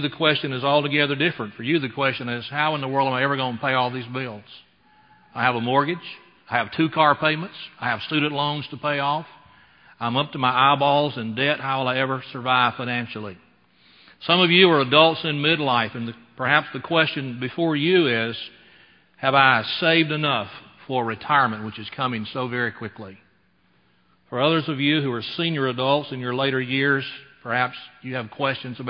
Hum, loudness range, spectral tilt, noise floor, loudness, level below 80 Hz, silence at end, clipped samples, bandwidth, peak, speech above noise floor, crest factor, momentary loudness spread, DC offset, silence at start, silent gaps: none; 6 LU; -9 dB/octave; -63 dBFS; -21 LUFS; -64 dBFS; 0 s; under 0.1%; 5.4 kHz; 0 dBFS; 40 dB; 22 dB; 14 LU; under 0.1%; 0 s; none